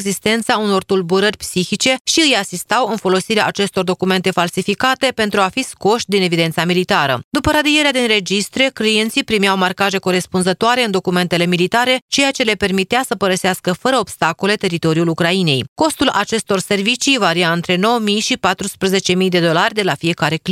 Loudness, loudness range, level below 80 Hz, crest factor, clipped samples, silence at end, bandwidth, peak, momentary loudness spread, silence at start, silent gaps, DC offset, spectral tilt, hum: -15 LUFS; 1 LU; -46 dBFS; 16 dB; under 0.1%; 0 s; 16 kHz; 0 dBFS; 4 LU; 0 s; 2.01-2.05 s, 7.24-7.31 s, 12.02-12.08 s, 15.68-15.76 s; under 0.1%; -4 dB/octave; none